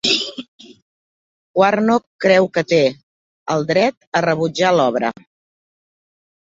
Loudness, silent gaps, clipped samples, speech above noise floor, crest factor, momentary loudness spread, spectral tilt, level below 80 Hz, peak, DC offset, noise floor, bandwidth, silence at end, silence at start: -17 LUFS; 0.48-0.59 s, 0.82-1.54 s, 2.07-2.19 s, 3.03-3.46 s, 3.97-4.01 s, 4.07-4.12 s; under 0.1%; over 74 dB; 18 dB; 10 LU; -4.5 dB/octave; -62 dBFS; -2 dBFS; under 0.1%; under -90 dBFS; 8 kHz; 1.4 s; 0.05 s